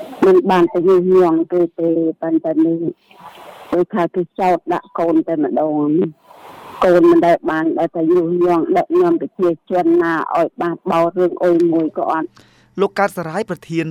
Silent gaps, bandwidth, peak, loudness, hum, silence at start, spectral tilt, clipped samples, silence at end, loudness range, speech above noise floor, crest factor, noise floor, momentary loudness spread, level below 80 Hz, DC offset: none; 11.5 kHz; -2 dBFS; -16 LUFS; none; 0 s; -7.5 dB/octave; under 0.1%; 0 s; 4 LU; 23 dB; 14 dB; -38 dBFS; 10 LU; -58 dBFS; under 0.1%